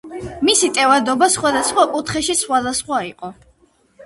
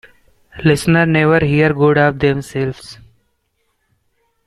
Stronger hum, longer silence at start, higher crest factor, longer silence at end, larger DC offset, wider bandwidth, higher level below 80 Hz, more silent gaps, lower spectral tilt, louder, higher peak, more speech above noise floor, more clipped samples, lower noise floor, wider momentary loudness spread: neither; second, 0.05 s vs 0.55 s; about the same, 18 dB vs 16 dB; second, 0 s vs 1.5 s; neither; second, 12 kHz vs 13.5 kHz; second, -50 dBFS vs -42 dBFS; neither; second, -2 dB/octave vs -7 dB/octave; about the same, -16 LUFS vs -14 LUFS; about the same, 0 dBFS vs -2 dBFS; second, 39 dB vs 52 dB; neither; second, -56 dBFS vs -66 dBFS; first, 15 LU vs 10 LU